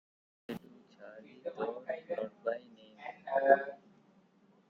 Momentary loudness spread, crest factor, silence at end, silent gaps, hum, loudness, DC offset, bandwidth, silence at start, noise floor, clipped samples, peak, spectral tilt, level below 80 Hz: 25 LU; 26 dB; 0.95 s; none; none; -35 LUFS; under 0.1%; 14.5 kHz; 0.5 s; -67 dBFS; under 0.1%; -10 dBFS; -6.5 dB/octave; -84 dBFS